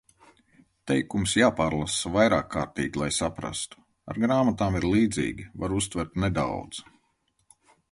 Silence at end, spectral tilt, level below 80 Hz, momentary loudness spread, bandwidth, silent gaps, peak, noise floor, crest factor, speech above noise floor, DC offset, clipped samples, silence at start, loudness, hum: 1.1 s; -4.5 dB/octave; -46 dBFS; 12 LU; 11.5 kHz; none; -6 dBFS; -72 dBFS; 20 dB; 46 dB; under 0.1%; under 0.1%; 0.85 s; -26 LUFS; none